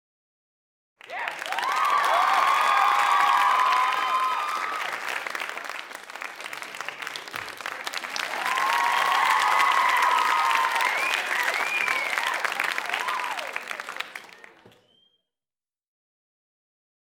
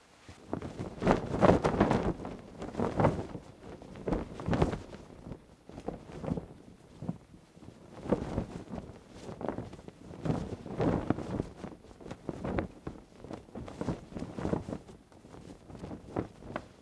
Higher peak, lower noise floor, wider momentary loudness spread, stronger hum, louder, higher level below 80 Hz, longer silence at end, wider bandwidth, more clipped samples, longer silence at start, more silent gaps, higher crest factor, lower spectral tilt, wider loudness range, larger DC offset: about the same, -6 dBFS vs -6 dBFS; first, under -90 dBFS vs -55 dBFS; second, 14 LU vs 21 LU; neither; first, -24 LUFS vs -35 LUFS; second, -82 dBFS vs -48 dBFS; first, 2.7 s vs 0.05 s; first, 18 kHz vs 11 kHz; neither; first, 1.05 s vs 0.2 s; neither; second, 20 dB vs 28 dB; second, 0.5 dB/octave vs -7.5 dB/octave; about the same, 11 LU vs 10 LU; neither